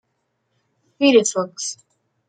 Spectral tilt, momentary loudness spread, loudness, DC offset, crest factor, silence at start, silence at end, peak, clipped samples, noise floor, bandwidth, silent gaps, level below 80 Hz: -3 dB/octave; 14 LU; -18 LUFS; under 0.1%; 20 dB; 1 s; 0.55 s; -2 dBFS; under 0.1%; -72 dBFS; 9.6 kHz; none; -72 dBFS